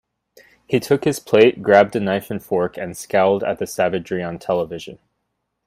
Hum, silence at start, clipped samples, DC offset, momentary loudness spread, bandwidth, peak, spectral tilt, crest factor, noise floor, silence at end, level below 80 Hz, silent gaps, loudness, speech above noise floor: none; 0.7 s; under 0.1%; under 0.1%; 11 LU; 16 kHz; 0 dBFS; -5.5 dB/octave; 20 dB; -75 dBFS; 0.7 s; -58 dBFS; none; -19 LUFS; 56 dB